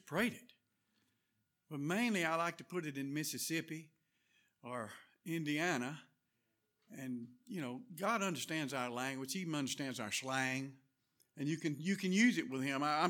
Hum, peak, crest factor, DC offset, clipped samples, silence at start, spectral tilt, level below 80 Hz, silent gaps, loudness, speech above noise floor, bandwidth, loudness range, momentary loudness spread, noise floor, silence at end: none; -20 dBFS; 20 dB; under 0.1%; under 0.1%; 0.05 s; -4 dB/octave; -86 dBFS; none; -39 LUFS; 45 dB; 18.5 kHz; 6 LU; 14 LU; -84 dBFS; 0 s